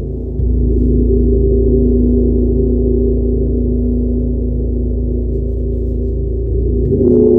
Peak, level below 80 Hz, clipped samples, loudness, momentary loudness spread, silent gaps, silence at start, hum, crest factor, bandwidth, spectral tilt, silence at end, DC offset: -2 dBFS; -16 dBFS; under 0.1%; -15 LUFS; 6 LU; none; 0 s; none; 12 dB; 1 kHz; -15 dB/octave; 0 s; under 0.1%